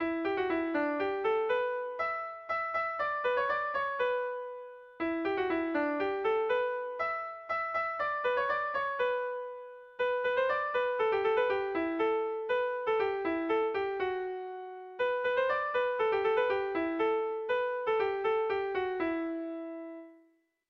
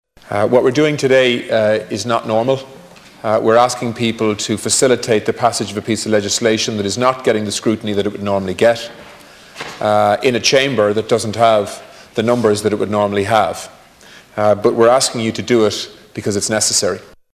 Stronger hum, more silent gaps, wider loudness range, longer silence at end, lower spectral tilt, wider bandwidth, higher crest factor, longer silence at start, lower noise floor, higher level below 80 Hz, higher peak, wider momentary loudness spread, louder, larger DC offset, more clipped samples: neither; neither; about the same, 2 LU vs 2 LU; first, 0.55 s vs 0.3 s; first, -6 dB/octave vs -4 dB/octave; second, 6.2 kHz vs 16 kHz; about the same, 14 dB vs 16 dB; second, 0 s vs 0.25 s; first, -68 dBFS vs -42 dBFS; second, -68 dBFS vs -50 dBFS; second, -18 dBFS vs 0 dBFS; about the same, 8 LU vs 9 LU; second, -32 LUFS vs -15 LUFS; neither; neither